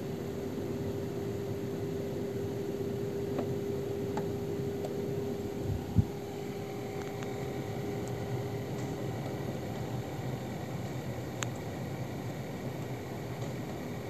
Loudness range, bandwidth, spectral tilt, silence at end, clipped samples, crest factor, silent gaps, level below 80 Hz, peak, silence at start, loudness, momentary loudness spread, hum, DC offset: 3 LU; 13.5 kHz; -6.5 dB/octave; 0 s; under 0.1%; 26 dB; none; -56 dBFS; -10 dBFS; 0 s; -37 LUFS; 4 LU; none; 0.2%